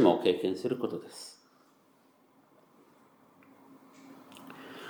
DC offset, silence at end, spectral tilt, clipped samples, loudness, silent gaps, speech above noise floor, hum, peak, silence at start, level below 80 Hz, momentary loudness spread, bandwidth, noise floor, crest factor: under 0.1%; 0 s; -6 dB/octave; under 0.1%; -31 LUFS; none; 33 dB; none; -8 dBFS; 0 s; -84 dBFS; 26 LU; over 20 kHz; -65 dBFS; 26 dB